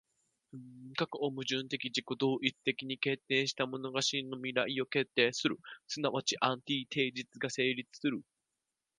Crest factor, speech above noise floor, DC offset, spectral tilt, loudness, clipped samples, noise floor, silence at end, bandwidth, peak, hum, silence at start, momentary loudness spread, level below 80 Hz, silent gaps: 24 dB; 53 dB; under 0.1%; -3.5 dB/octave; -34 LUFS; under 0.1%; -88 dBFS; 0.75 s; 10.5 kHz; -12 dBFS; none; 0.55 s; 8 LU; -82 dBFS; none